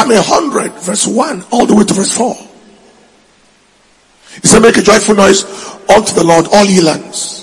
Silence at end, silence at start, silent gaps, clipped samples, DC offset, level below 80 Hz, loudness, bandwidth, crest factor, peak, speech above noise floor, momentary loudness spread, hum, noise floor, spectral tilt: 0 s; 0 s; none; 3%; under 0.1%; -40 dBFS; -9 LUFS; 12 kHz; 10 dB; 0 dBFS; 40 dB; 11 LU; none; -48 dBFS; -3.5 dB/octave